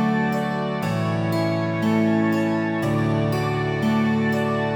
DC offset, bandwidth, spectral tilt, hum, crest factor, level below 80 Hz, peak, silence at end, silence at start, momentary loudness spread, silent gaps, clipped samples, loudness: under 0.1%; 18 kHz; -7.5 dB/octave; none; 14 dB; -52 dBFS; -8 dBFS; 0 s; 0 s; 4 LU; none; under 0.1%; -22 LUFS